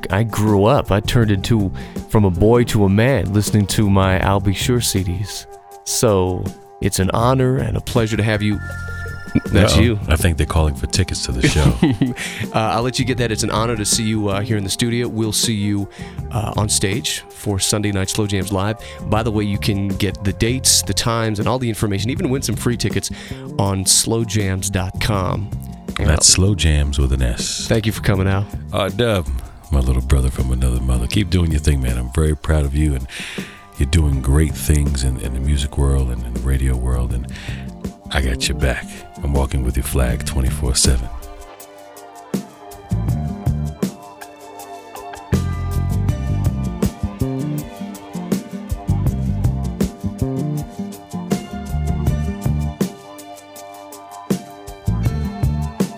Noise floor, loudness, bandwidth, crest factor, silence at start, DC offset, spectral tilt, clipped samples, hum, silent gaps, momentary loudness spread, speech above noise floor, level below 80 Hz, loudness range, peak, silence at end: -39 dBFS; -19 LUFS; 18 kHz; 18 dB; 0 s; under 0.1%; -4.5 dB/octave; under 0.1%; none; none; 14 LU; 22 dB; -26 dBFS; 7 LU; -2 dBFS; 0 s